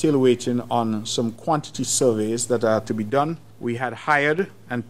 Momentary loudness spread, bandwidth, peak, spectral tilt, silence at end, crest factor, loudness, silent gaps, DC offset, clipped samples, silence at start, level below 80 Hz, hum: 8 LU; 15.5 kHz; -4 dBFS; -4.5 dB/octave; 0 s; 18 dB; -22 LUFS; none; 0.6%; under 0.1%; 0 s; -64 dBFS; none